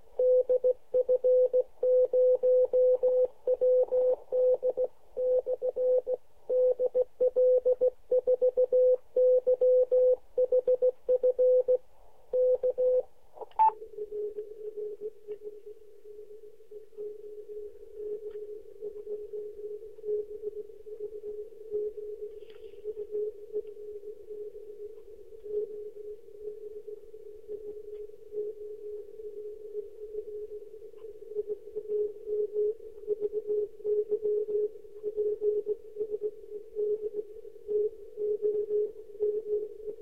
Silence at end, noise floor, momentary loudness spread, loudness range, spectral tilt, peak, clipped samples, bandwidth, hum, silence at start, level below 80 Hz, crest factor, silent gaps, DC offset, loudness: 0 s; -59 dBFS; 20 LU; 16 LU; -7.5 dB/octave; -16 dBFS; under 0.1%; 2.8 kHz; none; 0.2 s; -66 dBFS; 14 dB; none; 0.3%; -29 LUFS